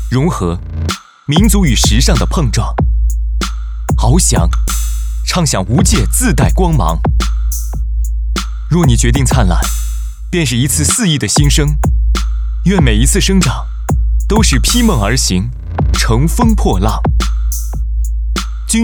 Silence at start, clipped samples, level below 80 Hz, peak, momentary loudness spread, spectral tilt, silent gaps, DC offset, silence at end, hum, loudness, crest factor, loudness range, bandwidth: 0 s; under 0.1%; -14 dBFS; 0 dBFS; 9 LU; -4.5 dB/octave; none; under 0.1%; 0 s; none; -13 LUFS; 12 dB; 2 LU; over 20 kHz